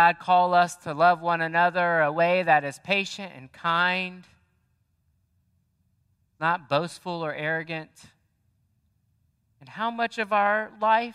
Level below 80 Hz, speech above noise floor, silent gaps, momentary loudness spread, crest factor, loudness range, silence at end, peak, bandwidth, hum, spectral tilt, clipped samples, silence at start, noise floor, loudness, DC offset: -74 dBFS; 46 dB; none; 12 LU; 20 dB; 10 LU; 0 s; -6 dBFS; 12.5 kHz; none; -4.5 dB/octave; under 0.1%; 0 s; -70 dBFS; -24 LUFS; under 0.1%